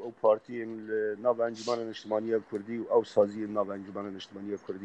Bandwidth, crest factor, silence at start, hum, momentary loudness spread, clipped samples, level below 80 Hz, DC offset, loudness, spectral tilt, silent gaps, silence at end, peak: 8.6 kHz; 20 dB; 0 s; none; 12 LU; under 0.1%; -78 dBFS; under 0.1%; -31 LUFS; -6 dB/octave; none; 0 s; -12 dBFS